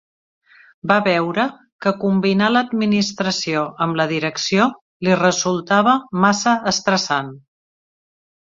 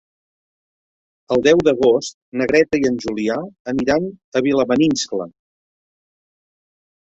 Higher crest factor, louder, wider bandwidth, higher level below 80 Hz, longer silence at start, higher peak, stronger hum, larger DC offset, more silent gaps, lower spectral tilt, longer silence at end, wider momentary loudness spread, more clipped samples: about the same, 18 dB vs 18 dB; about the same, -18 LUFS vs -18 LUFS; about the same, 7.8 kHz vs 8 kHz; second, -60 dBFS vs -52 dBFS; second, 0.85 s vs 1.3 s; about the same, -2 dBFS vs -2 dBFS; neither; neither; about the same, 1.72-1.79 s, 4.81-5.00 s vs 2.14-2.32 s, 3.60-3.65 s, 4.24-4.32 s; about the same, -4.5 dB/octave vs -5 dB/octave; second, 1.05 s vs 1.8 s; second, 6 LU vs 11 LU; neither